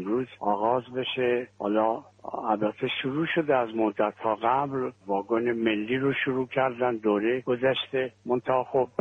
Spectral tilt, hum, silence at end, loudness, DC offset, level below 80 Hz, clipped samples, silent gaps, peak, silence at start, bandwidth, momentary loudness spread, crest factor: -7.5 dB/octave; none; 0.15 s; -27 LUFS; under 0.1%; -68 dBFS; under 0.1%; none; -10 dBFS; 0 s; 6.6 kHz; 5 LU; 18 dB